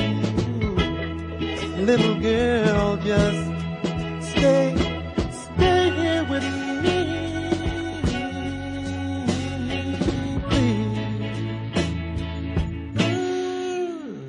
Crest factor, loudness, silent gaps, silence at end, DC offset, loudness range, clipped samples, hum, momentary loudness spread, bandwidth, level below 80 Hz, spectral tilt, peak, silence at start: 18 dB; -24 LUFS; none; 0 s; under 0.1%; 4 LU; under 0.1%; none; 9 LU; 10.5 kHz; -38 dBFS; -6 dB/octave; -6 dBFS; 0 s